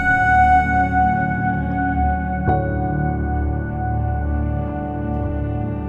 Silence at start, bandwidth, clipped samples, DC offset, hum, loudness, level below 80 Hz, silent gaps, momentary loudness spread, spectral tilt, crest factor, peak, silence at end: 0 s; 7 kHz; under 0.1%; under 0.1%; none; -20 LUFS; -28 dBFS; none; 9 LU; -9 dB/octave; 14 dB; -4 dBFS; 0 s